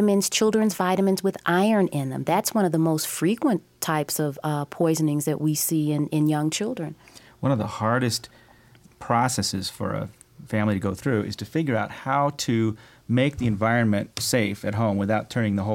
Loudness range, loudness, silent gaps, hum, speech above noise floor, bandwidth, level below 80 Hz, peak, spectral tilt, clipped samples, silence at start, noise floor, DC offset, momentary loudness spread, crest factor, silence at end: 4 LU; -24 LUFS; none; none; 30 dB; 17 kHz; -58 dBFS; -8 dBFS; -5 dB/octave; under 0.1%; 0 s; -53 dBFS; under 0.1%; 7 LU; 16 dB; 0 s